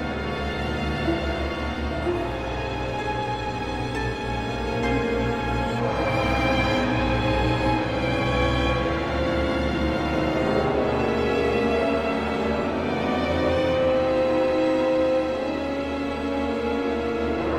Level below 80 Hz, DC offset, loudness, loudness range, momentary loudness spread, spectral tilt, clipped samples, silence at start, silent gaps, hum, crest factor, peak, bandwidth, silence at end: -34 dBFS; under 0.1%; -24 LUFS; 4 LU; 6 LU; -6.5 dB/octave; under 0.1%; 0 s; none; none; 14 dB; -8 dBFS; 13.5 kHz; 0 s